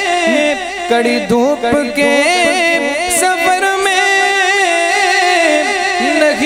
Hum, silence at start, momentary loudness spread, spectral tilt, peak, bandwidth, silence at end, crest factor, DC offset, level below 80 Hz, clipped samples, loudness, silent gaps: none; 0 s; 4 LU; -2 dB/octave; 0 dBFS; 16 kHz; 0 s; 12 dB; under 0.1%; -48 dBFS; under 0.1%; -12 LUFS; none